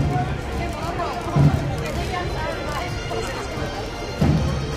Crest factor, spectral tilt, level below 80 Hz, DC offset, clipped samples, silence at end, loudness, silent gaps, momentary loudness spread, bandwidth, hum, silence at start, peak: 18 dB; -6.5 dB/octave; -32 dBFS; under 0.1%; under 0.1%; 0 s; -24 LUFS; none; 9 LU; 15.5 kHz; none; 0 s; -4 dBFS